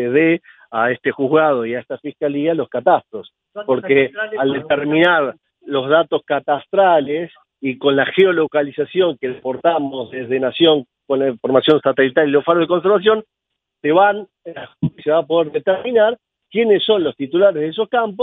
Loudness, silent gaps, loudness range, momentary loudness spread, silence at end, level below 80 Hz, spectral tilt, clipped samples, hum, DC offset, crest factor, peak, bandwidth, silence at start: -17 LUFS; none; 3 LU; 11 LU; 0 s; -62 dBFS; -8 dB/octave; under 0.1%; none; under 0.1%; 16 dB; 0 dBFS; 4 kHz; 0 s